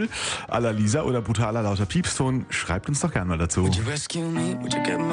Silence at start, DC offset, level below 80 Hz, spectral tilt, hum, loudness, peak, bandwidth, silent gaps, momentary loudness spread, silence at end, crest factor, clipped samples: 0 s; under 0.1%; -46 dBFS; -5 dB/octave; none; -25 LUFS; -8 dBFS; 10 kHz; none; 4 LU; 0 s; 16 dB; under 0.1%